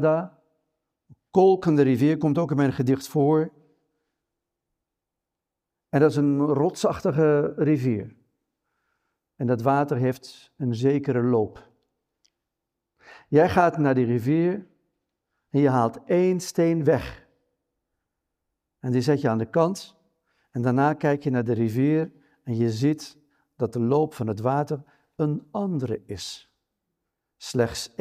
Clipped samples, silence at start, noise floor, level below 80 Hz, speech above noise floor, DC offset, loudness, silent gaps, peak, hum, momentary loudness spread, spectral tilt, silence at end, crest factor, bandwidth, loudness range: under 0.1%; 0 s; -86 dBFS; -60 dBFS; 63 dB; under 0.1%; -23 LUFS; none; -6 dBFS; none; 12 LU; -7.5 dB/octave; 0.15 s; 20 dB; 15 kHz; 5 LU